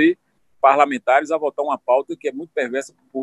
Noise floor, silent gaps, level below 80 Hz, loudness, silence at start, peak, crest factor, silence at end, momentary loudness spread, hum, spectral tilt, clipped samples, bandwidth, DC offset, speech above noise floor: -55 dBFS; none; -76 dBFS; -19 LUFS; 0 s; -2 dBFS; 18 dB; 0 s; 12 LU; none; -4.5 dB/octave; under 0.1%; 11.5 kHz; under 0.1%; 36 dB